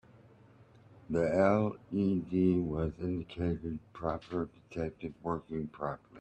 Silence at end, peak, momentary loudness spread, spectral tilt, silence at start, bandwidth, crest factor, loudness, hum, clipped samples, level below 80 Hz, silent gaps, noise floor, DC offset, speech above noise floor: 0 s; -14 dBFS; 12 LU; -9 dB/octave; 1.1 s; 8.4 kHz; 20 dB; -34 LUFS; none; under 0.1%; -56 dBFS; none; -59 dBFS; under 0.1%; 26 dB